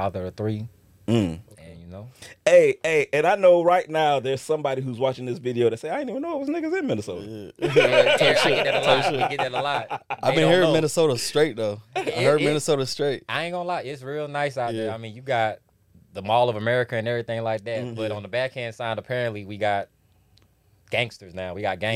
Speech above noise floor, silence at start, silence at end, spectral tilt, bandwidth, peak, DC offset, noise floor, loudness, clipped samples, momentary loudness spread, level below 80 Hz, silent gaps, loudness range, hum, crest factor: 37 dB; 0 s; 0 s; -5 dB/octave; 15 kHz; -4 dBFS; under 0.1%; -60 dBFS; -23 LUFS; under 0.1%; 14 LU; -60 dBFS; none; 8 LU; none; 20 dB